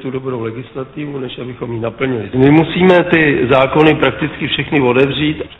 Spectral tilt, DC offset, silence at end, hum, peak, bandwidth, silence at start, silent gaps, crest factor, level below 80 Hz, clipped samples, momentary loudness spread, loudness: -8.5 dB/octave; under 0.1%; 0.05 s; none; 0 dBFS; 6 kHz; 0 s; none; 14 dB; -40 dBFS; under 0.1%; 14 LU; -13 LUFS